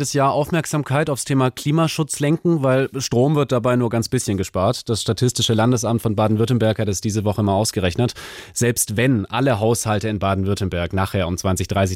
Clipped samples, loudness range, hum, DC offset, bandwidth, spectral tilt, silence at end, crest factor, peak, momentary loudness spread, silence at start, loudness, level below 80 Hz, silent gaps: under 0.1%; 1 LU; none; under 0.1%; 16.5 kHz; -5 dB/octave; 0 s; 14 dB; -6 dBFS; 4 LU; 0 s; -19 LUFS; -48 dBFS; none